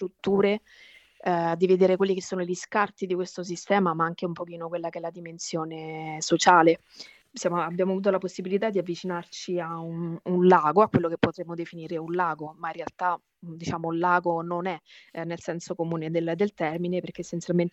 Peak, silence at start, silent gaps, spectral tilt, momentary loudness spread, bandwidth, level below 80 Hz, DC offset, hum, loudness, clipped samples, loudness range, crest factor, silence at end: -4 dBFS; 0 s; none; -5.5 dB/octave; 14 LU; 8.4 kHz; -66 dBFS; under 0.1%; none; -26 LUFS; under 0.1%; 5 LU; 22 dB; 0.05 s